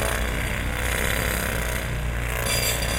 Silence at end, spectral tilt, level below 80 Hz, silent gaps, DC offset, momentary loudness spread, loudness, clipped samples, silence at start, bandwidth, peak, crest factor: 0 s; -3.5 dB/octave; -30 dBFS; none; under 0.1%; 5 LU; -25 LUFS; under 0.1%; 0 s; 17 kHz; -8 dBFS; 16 dB